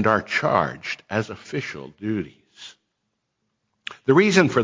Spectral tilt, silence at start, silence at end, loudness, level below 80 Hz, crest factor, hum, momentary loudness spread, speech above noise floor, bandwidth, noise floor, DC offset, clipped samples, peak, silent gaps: -5.5 dB/octave; 0 s; 0 s; -22 LUFS; -56 dBFS; 20 dB; none; 24 LU; 55 dB; 7.6 kHz; -77 dBFS; under 0.1%; under 0.1%; -4 dBFS; none